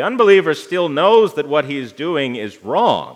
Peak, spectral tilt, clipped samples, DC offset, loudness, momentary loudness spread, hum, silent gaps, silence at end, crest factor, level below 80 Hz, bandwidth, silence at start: 0 dBFS; -5.5 dB/octave; under 0.1%; under 0.1%; -16 LUFS; 11 LU; none; none; 0 s; 16 dB; -72 dBFS; 12.5 kHz; 0 s